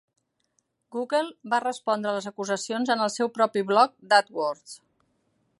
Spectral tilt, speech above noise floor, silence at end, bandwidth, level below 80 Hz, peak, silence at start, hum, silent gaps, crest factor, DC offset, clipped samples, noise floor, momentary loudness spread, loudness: -3.5 dB/octave; 48 dB; 0.85 s; 11.5 kHz; -80 dBFS; -4 dBFS; 0.9 s; none; none; 22 dB; under 0.1%; under 0.1%; -74 dBFS; 9 LU; -25 LUFS